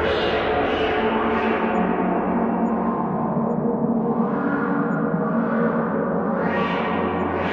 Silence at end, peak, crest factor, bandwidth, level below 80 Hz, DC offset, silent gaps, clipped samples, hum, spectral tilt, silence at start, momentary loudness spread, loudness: 0 s; -8 dBFS; 12 dB; 6.2 kHz; -48 dBFS; under 0.1%; none; under 0.1%; none; -8.5 dB/octave; 0 s; 2 LU; -22 LUFS